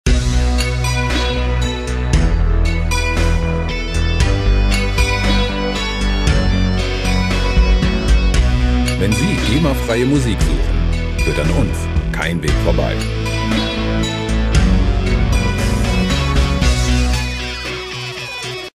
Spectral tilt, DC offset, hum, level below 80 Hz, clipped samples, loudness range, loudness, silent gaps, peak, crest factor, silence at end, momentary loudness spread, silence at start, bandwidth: -5.5 dB/octave; under 0.1%; none; -18 dBFS; under 0.1%; 2 LU; -17 LUFS; none; 0 dBFS; 14 dB; 0.1 s; 5 LU; 0.05 s; 14 kHz